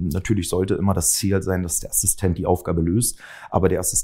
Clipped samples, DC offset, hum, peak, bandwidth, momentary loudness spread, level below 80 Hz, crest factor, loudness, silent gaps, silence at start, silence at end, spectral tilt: under 0.1%; under 0.1%; none; -2 dBFS; 16.5 kHz; 4 LU; -38 dBFS; 20 dB; -21 LUFS; none; 0 s; 0 s; -4.5 dB/octave